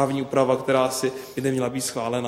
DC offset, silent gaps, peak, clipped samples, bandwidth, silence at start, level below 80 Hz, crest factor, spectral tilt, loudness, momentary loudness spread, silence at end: under 0.1%; none; -6 dBFS; under 0.1%; 16 kHz; 0 s; -62 dBFS; 18 dB; -4.5 dB/octave; -24 LUFS; 6 LU; 0 s